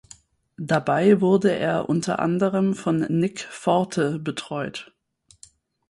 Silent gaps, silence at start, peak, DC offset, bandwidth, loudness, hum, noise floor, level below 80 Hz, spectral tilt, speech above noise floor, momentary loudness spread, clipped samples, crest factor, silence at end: none; 0.6 s; -4 dBFS; under 0.1%; 11.5 kHz; -22 LUFS; none; -59 dBFS; -62 dBFS; -6.5 dB/octave; 38 dB; 12 LU; under 0.1%; 18 dB; 1.05 s